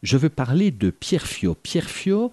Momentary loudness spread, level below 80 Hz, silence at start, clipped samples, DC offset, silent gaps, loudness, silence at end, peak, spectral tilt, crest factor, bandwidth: 5 LU; -46 dBFS; 0.05 s; under 0.1%; under 0.1%; none; -22 LUFS; 0.05 s; -6 dBFS; -6 dB/octave; 16 dB; 12 kHz